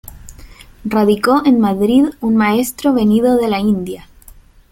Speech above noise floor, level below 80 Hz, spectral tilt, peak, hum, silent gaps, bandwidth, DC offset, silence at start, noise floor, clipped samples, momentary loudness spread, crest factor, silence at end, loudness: 29 dB; -42 dBFS; -6 dB/octave; 0 dBFS; none; none; 17 kHz; under 0.1%; 0.05 s; -42 dBFS; under 0.1%; 8 LU; 14 dB; 0.7 s; -14 LUFS